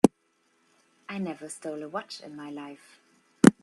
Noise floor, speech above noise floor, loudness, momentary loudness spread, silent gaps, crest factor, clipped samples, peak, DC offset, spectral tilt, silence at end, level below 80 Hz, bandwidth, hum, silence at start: -70 dBFS; 33 dB; -30 LUFS; 22 LU; none; 28 dB; under 0.1%; 0 dBFS; under 0.1%; -6 dB/octave; 0.1 s; -68 dBFS; 13 kHz; none; 0.05 s